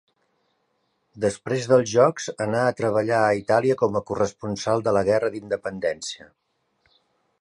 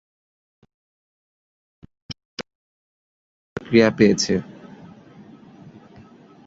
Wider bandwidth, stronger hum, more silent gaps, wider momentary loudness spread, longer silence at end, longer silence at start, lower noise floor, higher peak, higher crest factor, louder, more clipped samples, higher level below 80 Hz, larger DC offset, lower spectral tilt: first, 11 kHz vs 7.8 kHz; neither; second, none vs 2.25-2.37 s, 2.55-3.56 s; second, 9 LU vs 25 LU; second, 1.25 s vs 2.05 s; second, 1.15 s vs 2.1 s; first, -71 dBFS vs -47 dBFS; about the same, -4 dBFS vs -2 dBFS; about the same, 20 dB vs 24 dB; second, -23 LUFS vs -18 LUFS; neither; about the same, -58 dBFS vs -56 dBFS; neither; about the same, -5 dB/octave vs -5 dB/octave